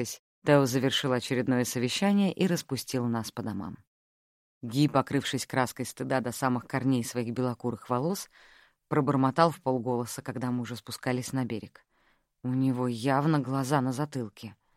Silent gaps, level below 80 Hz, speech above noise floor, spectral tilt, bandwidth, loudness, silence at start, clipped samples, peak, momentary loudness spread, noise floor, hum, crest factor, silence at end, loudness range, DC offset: 0.19-0.42 s, 3.87-4.61 s; -68 dBFS; 41 dB; -5.5 dB/octave; 16 kHz; -29 LUFS; 0 s; under 0.1%; -8 dBFS; 11 LU; -69 dBFS; none; 22 dB; 0.25 s; 3 LU; under 0.1%